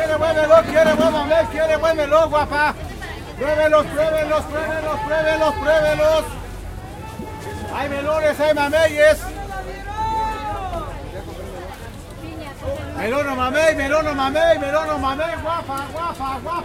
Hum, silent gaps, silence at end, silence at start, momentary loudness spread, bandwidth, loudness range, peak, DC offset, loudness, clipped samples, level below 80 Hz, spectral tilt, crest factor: none; none; 0 s; 0 s; 17 LU; 16 kHz; 8 LU; -2 dBFS; under 0.1%; -18 LUFS; under 0.1%; -36 dBFS; -5 dB/octave; 18 dB